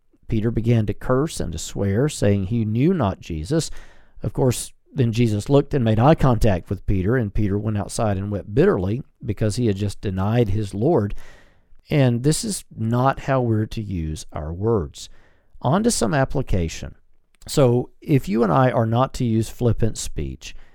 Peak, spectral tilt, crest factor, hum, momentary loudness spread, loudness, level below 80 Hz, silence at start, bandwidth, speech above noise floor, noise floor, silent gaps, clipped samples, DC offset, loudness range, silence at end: -2 dBFS; -6.5 dB/octave; 20 dB; none; 11 LU; -21 LUFS; -34 dBFS; 0.3 s; 17 kHz; 27 dB; -48 dBFS; none; under 0.1%; under 0.1%; 4 LU; 0.1 s